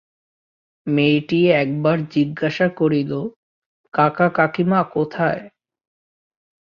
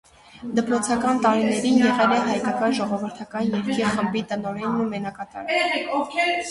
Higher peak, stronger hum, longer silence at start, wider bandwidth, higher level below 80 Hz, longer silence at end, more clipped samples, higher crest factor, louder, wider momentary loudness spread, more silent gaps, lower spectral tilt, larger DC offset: first, -2 dBFS vs -6 dBFS; neither; first, 0.85 s vs 0.35 s; second, 6.8 kHz vs 11.5 kHz; about the same, -60 dBFS vs -58 dBFS; first, 1.3 s vs 0 s; neither; about the same, 18 dB vs 18 dB; first, -19 LUFS vs -22 LUFS; about the same, 9 LU vs 10 LU; first, 3.36-3.84 s vs none; first, -8.5 dB/octave vs -4.5 dB/octave; neither